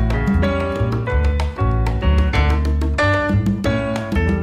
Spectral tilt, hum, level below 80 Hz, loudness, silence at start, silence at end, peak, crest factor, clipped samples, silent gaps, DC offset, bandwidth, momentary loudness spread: -7.5 dB/octave; none; -20 dBFS; -19 LUFS; 0 s; 0 s; -6 dBFS; 12 dB; under 0.1%; none; under 0.1%; 9.6 kHz; 3 LU